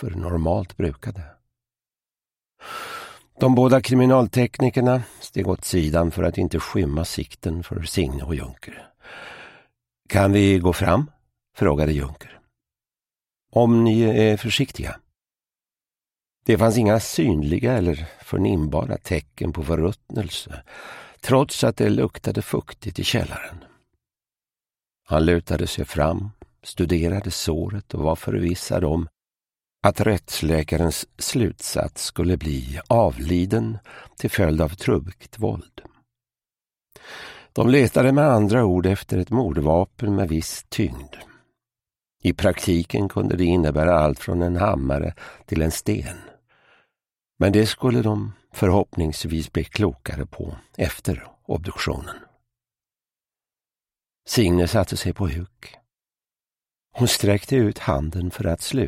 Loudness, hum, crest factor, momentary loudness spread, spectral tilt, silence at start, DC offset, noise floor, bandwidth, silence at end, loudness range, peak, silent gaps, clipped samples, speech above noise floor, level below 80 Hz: -22 LUFS; none; 22 dB; 17 LU; -6 dB/octave; 0 s; under 0.1%; under -90 dBFS; 16 kHz; 0 s; 7 LU; 0 dBFS; none; under 0.1%; over 69 dB; -38 dBFS